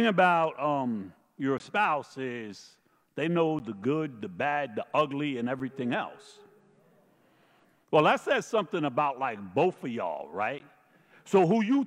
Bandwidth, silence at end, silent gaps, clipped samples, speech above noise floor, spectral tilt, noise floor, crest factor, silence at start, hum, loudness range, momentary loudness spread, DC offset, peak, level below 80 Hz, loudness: 13 kHz; 0 s; none; under 0.1%; 36 dB; -6 dB/octave; -65 dBFS; 20 dB; 0 s; none; 4 LU; 13 LU; under 0.1%; -10 dBFS; -78 dBFS; -29 LUFS